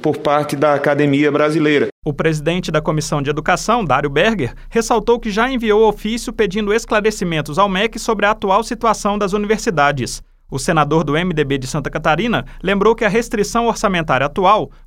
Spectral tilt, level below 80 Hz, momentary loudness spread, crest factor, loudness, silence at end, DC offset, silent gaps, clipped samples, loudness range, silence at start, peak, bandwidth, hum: -5 dB/octave; -36 dBFS; 6 LU; 16 dB; -16 LUFS; 0.15 s; under 0.1%; 1.92-2.02 s; under 0.1%; 1 LU; 0 s; 0 dBFS; 16 kHz; none